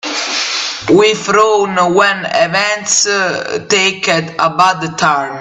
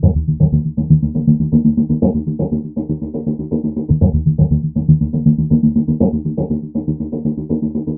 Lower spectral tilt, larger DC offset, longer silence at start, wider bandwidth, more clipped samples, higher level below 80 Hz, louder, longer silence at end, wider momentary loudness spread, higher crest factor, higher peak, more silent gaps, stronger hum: second, -2.5 dB/octave vs -17.5 dB/octave; neither; about the same, 0.05 s vs 0 s; first, 9 kHz vs 1.1 kHz; neither; second, -54 dBFS vs -28 dBFS; first, -12 LUFS vs -16 LUFS; about the same, 0 s vs 0 s; second, 5 LU vs 8 LU; about the same, 12 dB vs 16 dB; about the same, 0 dBFS vs 0 dBFS; neither; neither